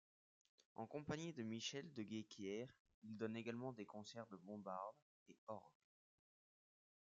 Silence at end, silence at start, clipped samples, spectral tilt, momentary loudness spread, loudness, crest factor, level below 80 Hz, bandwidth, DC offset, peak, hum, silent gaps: 1.35 s; 0.75 s; under 0.1%; -4.5 dB/octave; 9 LU; -52 LUFS; 22 dB; -86 dBFS; 7.6 kHz; under 0.1%; -32 dBFS; none; 2.80-2.85 s, 2.94-3.02 s, 5.02-5.26 s, 5.38-5.47 s